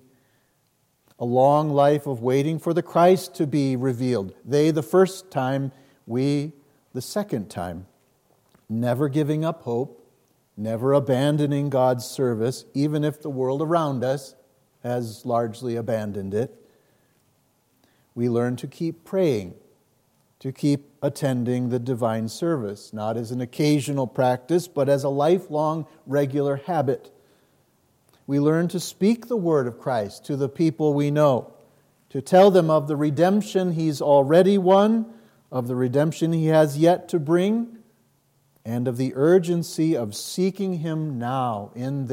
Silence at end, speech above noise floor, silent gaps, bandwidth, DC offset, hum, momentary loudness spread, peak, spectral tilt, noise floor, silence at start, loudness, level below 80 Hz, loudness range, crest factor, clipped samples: 0 s; 45 dB; none; 16.5 kHz; under 0.1%; none; 12 LU; -4 dBFS; -7 dB/octave; -67 dBFS; 1.2 s; -23 LUFS; -72 dBFS; 8 LU; 18 dB; under 0.1%